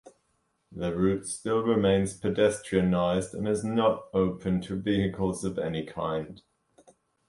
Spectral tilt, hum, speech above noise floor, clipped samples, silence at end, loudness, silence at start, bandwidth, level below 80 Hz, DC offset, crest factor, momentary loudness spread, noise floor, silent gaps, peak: -6 dB/octave; none; 47 dB; under 0.1%; 0.9 s; -28 LUFS; 0.05 s; 11.5 kHz; -52 dBFS; under 0.1%; 18 dB; 8 LU; -74 dBFS; none; -10 dBFS